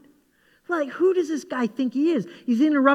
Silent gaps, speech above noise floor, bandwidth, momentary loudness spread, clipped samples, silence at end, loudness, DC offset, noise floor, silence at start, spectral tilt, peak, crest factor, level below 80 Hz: none; 40 dB; 11 kHz; 7 LU; under 0.1%; 0 s; -23 LUFS; under 0.1%; -62 dBFS; 0.7 s; -6 dB/octave; -4 dBFS; 20 dB; -78 dBFS